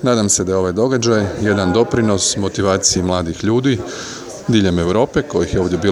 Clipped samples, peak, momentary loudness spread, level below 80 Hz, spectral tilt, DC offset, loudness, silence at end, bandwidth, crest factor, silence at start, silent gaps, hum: under 0.1%; 0 dBFS; 5 LU; -40 dBFS; -4.5 dB/octave; under 0.1%; -16 LUFS; 0 s; 14 kHz; 16 dB; 0 s; none; none